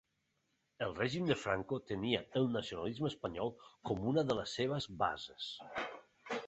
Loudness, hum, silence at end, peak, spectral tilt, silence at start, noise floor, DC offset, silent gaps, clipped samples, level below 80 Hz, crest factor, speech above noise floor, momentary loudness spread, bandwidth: -38 LUFS; none; 0 s; -16 dBFS; -4 dB/octave; 0.8 s; -81 dBFS; under 0.1%; none; under 0.1%; -64 dBFS; 22 dB; 44 dB; 9 LU; 8 kHz